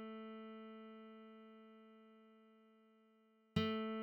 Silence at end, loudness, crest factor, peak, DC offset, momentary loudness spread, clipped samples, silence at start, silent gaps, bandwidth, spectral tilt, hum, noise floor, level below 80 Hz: 0 s; -46 LUFS; 26 dB; -22 dBFS; under 0.1%; 26 LU; under 0.1%; 0 s; none; 17.5 kHz; -7 dB/octave; none; -73 dBFS; -74 dBFS